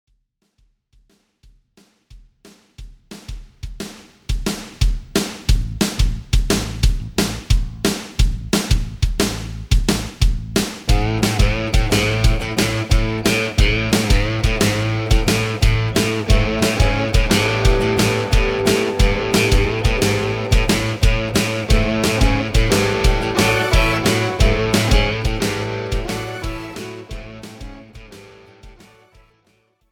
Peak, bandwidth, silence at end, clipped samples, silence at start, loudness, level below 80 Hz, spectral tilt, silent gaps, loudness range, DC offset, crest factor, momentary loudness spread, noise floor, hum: -2 dBFS; 18 kHz; 1.2 s; under 0.1%; 2.15 s; -18 LUFS; -22 dBFS; -4.5 dB/octave; none; 12 LU; under 0.1%; 16 dB; 12 LU; -65 dBFS; none